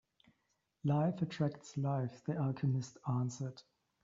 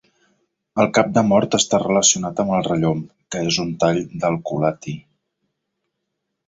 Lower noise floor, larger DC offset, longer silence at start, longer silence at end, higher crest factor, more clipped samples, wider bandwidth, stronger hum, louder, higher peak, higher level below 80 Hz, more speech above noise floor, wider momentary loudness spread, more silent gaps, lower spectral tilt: first, -82 dBFS vs -77 dBFS; neither; about the same, 0.85 s vs 0.75 s; second, 0.4 s vs 1.45 s; about the same, 16 dB vs 18 dB; neither; about the same, 7.6 kHz vs 8 kHz; neither; second, -38 LUFS vs -19 LUFS; second, -22 dBFS vs -2 dBFS; second, -74 dBFS vs -54 dBFS; second, 45 dB vs 59 dB; second, 7 LU vs 13 LU; neither; first, -8.5 dB/octave vs -4 dB/octave